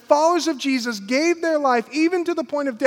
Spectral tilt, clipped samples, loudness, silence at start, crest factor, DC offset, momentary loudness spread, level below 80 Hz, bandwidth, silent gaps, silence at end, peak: -3 dB/octave; under 0.1%; -20 LUFS; 0.1 s; 18 dB; under 0.1%; 6 LU; -76 dBFS; 15.5 kHz; none; 0 s; -2 dBFS